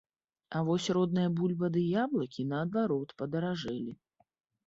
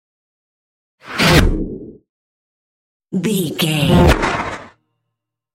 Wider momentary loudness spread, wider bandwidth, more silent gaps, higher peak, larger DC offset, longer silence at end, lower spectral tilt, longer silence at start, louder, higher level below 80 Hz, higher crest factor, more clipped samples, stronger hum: second, 7 LU vs 16 LU; second, 8 kHz vs 16.5 kHz; second, none vs 2.09-3.00 s; second, -18 dBFS vs 0 dBFS; neither; second, 0.75 s vs 0.9 s; first, -7 dB/octave vs -5 dB/octave; second, 0.5 s vs 1.05 s; second, -32 LUFS vs -15 LUFS; second, -70 dBFS vs -26 dBFS; about the same, 14 dB vs 18 dB; neither; neither